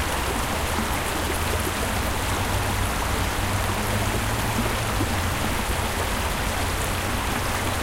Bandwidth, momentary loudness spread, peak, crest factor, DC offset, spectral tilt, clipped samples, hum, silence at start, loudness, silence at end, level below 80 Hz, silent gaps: 17 kHz; 1 LU; -10 dBFS; 14 dB; under 0.1%; -4 dB/octave; under 0.1%; none; 0 s; -25 LUFS; 0 s; -32 dBFS; none